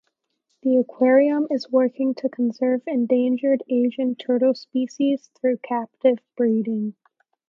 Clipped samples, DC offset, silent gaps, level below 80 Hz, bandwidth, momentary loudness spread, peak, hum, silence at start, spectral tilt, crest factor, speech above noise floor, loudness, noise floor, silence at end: under 0.1%; under 0.1%; none; -78 dBFS; 7 kHz; 8 LU; -6 dBFS; none; 0.65 s; -7 dB/octave; 16 dB; 53 dB; -22 LUFS; -73 dBFS; 0.55 s